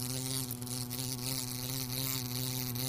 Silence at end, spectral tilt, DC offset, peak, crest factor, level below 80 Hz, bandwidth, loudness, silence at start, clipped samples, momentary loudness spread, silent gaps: 0 s; -3.5 dB/octave; under 0.1%; -16 dBFS; 20 dB; -58 dBFS; 16 kHz; -35 LUFS; 0 s; under 0.1%; 3 LU; none